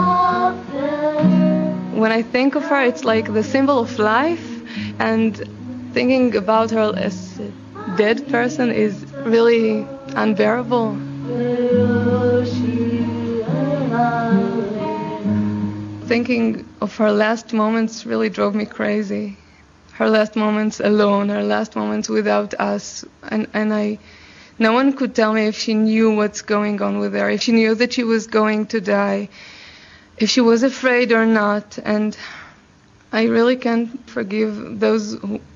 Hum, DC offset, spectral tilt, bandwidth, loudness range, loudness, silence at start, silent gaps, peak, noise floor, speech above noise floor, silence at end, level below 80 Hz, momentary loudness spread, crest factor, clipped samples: none; under 0.1%; -6 dB/octave; 7.6 kHz; 3 LU; -18 LUFS; 0 s; none; -2 dBFS; -50 dBFS; 32 dB; 0.15 s; -58 dBFS; 10 LU; 18 dB; under 0.1%